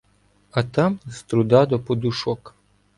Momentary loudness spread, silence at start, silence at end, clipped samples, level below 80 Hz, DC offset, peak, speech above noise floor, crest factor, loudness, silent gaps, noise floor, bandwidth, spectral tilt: 11 LU; 0.55 s; 0.5 s; under 0.1%; -54 dBFS; under 0.1%; -4 dBFS; 40 dB; 18 dB; -22 LUFS; none; -60 dBFS; 11.5 kHz; -7 dB/octave